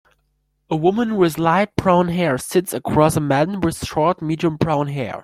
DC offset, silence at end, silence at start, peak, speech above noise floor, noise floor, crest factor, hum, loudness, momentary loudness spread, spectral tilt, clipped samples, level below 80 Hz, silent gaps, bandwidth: under 0.1%; 0 s; 0.7 s; -2 dBFS; 49 dB; -67 dBFS; 16 dB; none; -19 LUFS; 5 LU; -6 dB/octave; under 0.1%; -46 dBFS; none; 16 kHz